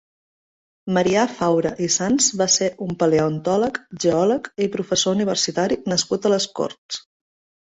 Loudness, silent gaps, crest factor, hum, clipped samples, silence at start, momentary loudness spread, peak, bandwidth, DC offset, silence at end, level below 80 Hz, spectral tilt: -20 LUFS; 6.78-6.89 s; 16 dB; none; under 0.1%; 0.85 s; 7 LU; -4 dBFS; 8.2 kHz; under 0.1%; 0.65 s; -58 dBFS; -3.5 dB/octave